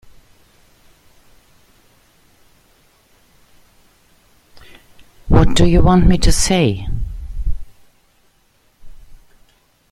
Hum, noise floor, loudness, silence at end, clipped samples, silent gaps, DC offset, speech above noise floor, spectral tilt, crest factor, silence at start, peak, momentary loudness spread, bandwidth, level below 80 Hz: none; -57 dBFS; -16 LUFS; 0.75 s; under 0.1%; none; under 0.1%; 46 dB; -5.5 dB/octave; 18 dB; 5.25 s; 0 dBFS; 17 LU; 13.5 kHz; -24 dBFS